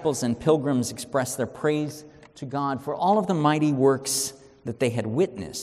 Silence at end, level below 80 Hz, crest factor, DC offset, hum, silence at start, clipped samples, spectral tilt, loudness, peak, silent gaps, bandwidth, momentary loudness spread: 0 s; -60 dBFS; 18 dB; under 0.1%; none; 0 s; under 0.1%; -5 dB/octave; -25 LUFS; -6 dBFS; none; 15 kHz; 11 LU